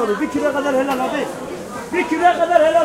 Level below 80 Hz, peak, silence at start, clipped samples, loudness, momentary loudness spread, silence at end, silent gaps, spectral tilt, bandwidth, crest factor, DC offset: -52 dBFS; 0 dBFS; 0 s; under 0.1%; -18 LUFS; 14 LU; 0 s; none; -4.5 dB/octave; 16 kHz; 16 dB; under 0.1%